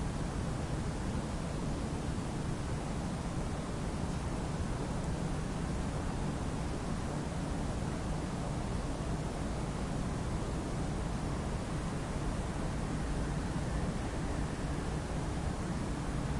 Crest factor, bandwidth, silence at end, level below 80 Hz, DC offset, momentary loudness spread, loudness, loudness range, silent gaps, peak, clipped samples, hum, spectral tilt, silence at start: 12 dB; 11.5 kHz; 0 s; -42 dBFS; under 0.1%; 1 LU; -37 LUFS; 1 LU; none; -22 dBFS; under 0.1%; none; -6 dB/octave; 0 s